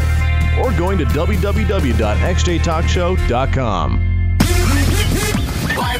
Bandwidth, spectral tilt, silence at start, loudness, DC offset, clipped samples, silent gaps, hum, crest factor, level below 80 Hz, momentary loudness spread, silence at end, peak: 16 kHz; -5.5 dB/octave; 0 s; -16 LUFS; 0.3%; under 0.1%; none; none; 14 dB; -20 dBFS; 3 LU; 0 s; 0 dBFS